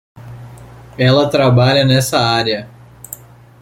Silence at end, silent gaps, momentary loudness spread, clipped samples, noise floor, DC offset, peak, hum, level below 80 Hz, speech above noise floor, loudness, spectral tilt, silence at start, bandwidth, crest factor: 0.45 s; none; 23 LU; under 0.1%; -36 dBFS; under 0.1%; -2 dBFS; none; -46 dBFS; 24 dB; -13 LUFS; -5.5 dB/octave; 0.15 s; 16.5 kHz; 14 dB